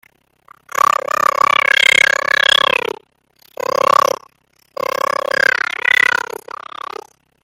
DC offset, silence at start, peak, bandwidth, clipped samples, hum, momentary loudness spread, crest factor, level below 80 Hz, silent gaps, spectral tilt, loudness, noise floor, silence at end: under 0.1%; 1.2 s; 0 dBFS; 17 kHz; under 0.1%; none; 19 LU; 16 dB; -62 dBFS; none; 0 dB/octave; -13 LUFS; -55 dBFS; 1.5 s